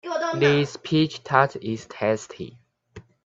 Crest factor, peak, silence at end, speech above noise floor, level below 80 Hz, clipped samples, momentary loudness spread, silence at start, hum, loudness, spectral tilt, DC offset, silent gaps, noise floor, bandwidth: 22 dB; -2 dBFS; 0.25 s; 25 dB; -62 dBFS; under 0.1%; 15 LU; 0.05 s; none; -23 LUFS; -6 dB/octave; under 0.1%; none; -48 dBFS; 7.8 kHz